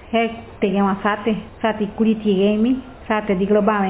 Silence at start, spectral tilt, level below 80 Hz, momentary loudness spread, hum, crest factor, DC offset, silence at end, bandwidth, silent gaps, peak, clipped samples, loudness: 0 s; -11 dB/octave; -46 dBFS; 7 LU; none; 16 dB; under 0.1%; 0 s; 4 kHz; none; -4 dBFS; under 0.1%; -20 LUFS